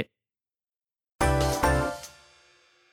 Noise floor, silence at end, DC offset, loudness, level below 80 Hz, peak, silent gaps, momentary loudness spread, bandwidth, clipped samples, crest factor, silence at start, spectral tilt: under -90 dBFS; 0.85 s; under 0.1%; -26 LUFS; -38 dBFS; -10 dBFS; 1.15-1.19 s; 16 LU; 18 kHz; under 0.1%; 20 dB; 0 s; -5 dB/octave